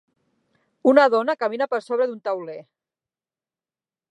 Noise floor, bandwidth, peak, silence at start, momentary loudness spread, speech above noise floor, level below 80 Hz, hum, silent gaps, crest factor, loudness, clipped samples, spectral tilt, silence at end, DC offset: under -90 dBFS; 10 kHz; -2 dBFS; 0.85 s; 14 LU; over 70 dB; -84 dBFS; none; none; 22 dB; -21 LUFS; under 0.1%; -5.5 dB/octave; 1.5 s; under 0.1%